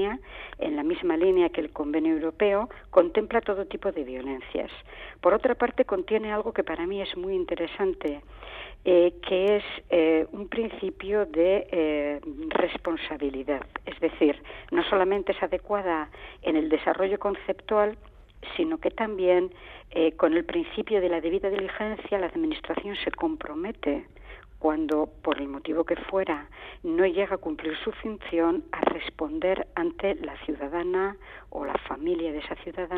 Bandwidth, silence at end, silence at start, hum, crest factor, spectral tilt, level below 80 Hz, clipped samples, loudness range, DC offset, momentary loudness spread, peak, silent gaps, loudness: 4.6 kHz; 0 s; 0 s; none; 20 dB; -7.5 dB/octave; -50 dBFS; under 0.1%; 4 LU; under 0.1%; 11 LU; -6 dBFS; none; -27 LUFS